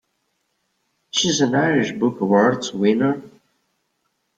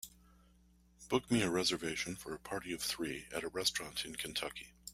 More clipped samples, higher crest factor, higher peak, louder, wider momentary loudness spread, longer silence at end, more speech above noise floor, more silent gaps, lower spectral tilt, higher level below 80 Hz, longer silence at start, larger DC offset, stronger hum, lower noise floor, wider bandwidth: neither; about the same, 18 dB vs 22 dB; first, -4 dBFS vs -18 dBFS; first, -19 LUFS vs -37 LUFS; second, 6 LU vs 10 LU; first, 1.1 s vs 0 s; first, 53 dB vs 29 dB; neither; first, -4.5 dB/octave vs -3 dB/octave; about the same, -62 dBFS vs -64 dBFS; first, 1.15 s vs 0 s; neither; neither; first, -71 dBFS vs -67 dBFS; second, 9.2 kHz vs 16 kHz